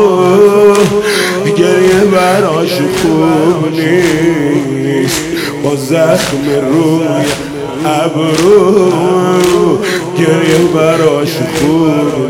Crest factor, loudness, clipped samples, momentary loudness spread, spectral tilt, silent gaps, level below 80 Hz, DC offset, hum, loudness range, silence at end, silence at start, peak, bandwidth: 10 dB; -10 LUFS; 1%; 7 LU; -5.5 dB/octave; none; -42 dBFS; under 0.1%; none; 3 LU; 0 s; 0 s; 0 dBFS; 17 kHz